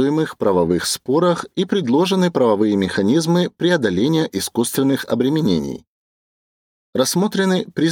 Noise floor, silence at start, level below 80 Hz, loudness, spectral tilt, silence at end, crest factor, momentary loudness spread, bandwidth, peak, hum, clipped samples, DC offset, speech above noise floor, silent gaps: under -90 dBFS; 0 s; -54 dBFS; -18 LUFS; -5 dB/octave; 0 s; 14 dB; 4 LU; 19.5 kHz; -4 dBFS; none; under 0.1%; under 0.1%; over 73 dB; 5.87-6.93 s